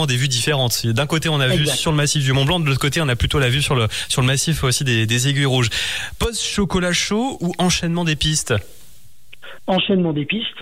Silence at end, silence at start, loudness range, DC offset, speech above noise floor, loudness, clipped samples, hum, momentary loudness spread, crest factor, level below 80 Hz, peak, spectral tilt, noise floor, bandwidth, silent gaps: 0 s; 0 s; 3 LU; 1%; 32 dB; -18 LUFS; under 0.1%; none; 4 LU; 12 dB; -36 dBFS; -6 dBFS; -4 dB/octave; -50 dBFS; 16 kHz; none